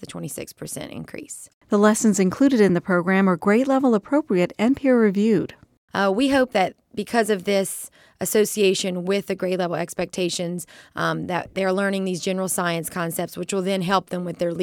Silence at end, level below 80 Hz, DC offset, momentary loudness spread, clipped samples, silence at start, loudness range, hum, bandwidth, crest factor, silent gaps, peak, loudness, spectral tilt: 0 s; -60 dBFS; under 0.1%; 14 LU; under 0.1%; 0 s; 6 LU; none; 18 kHz; 18 dB; 1.54-1.61 s, 5.77-5.88 s; -4 dBFS; -21 LUFS; -5 dB/octave